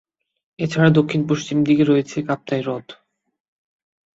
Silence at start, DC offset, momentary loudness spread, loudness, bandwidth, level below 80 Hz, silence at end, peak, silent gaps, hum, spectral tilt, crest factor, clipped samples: 0.6 s; under 0.1%; 11 LU; -19 LUFS; 7.8 kHz; -58 dBFS; 1.25 s; -2 dBFS; none; none; -7 dB/octave; 18 dB; under 0.1%